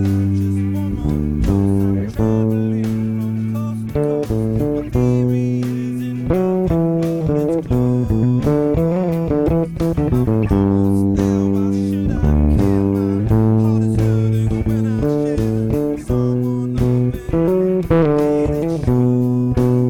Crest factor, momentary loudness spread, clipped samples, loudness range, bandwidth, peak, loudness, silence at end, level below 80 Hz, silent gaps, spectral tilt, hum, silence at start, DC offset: 10 dB; 5 LU; under 0.1%; 3 LU; 16 kHz; -6 dBFS; -17 LUFS; 0 s; -30 dBFS; none; -9.5 dB/octave; none; 0 s; 0.3%